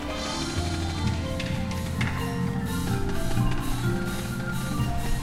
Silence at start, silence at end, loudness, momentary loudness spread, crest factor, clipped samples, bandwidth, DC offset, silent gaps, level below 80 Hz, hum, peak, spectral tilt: 0 s; 0 s; -29 LUFS; 3 LU; 16 dB; under 0.1%; 16 kHz; under 0.1%; none; -34 dBFS; none; -12 dBFS; -5.5 dB/octave